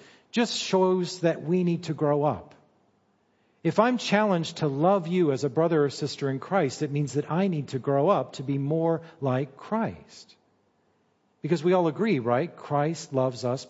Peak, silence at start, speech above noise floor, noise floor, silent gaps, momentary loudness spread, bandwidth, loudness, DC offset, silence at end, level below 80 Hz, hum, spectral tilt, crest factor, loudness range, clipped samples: -6 dBFS; 0.35 s; 43 dB; -68 dBFS; none; 7 LU; 8 kHz; -26 LUFS; under 0.1%; 0 s; -70 dBFS; none; -6.5 dB/octave; 20 dB; 4 LU; under 0.1%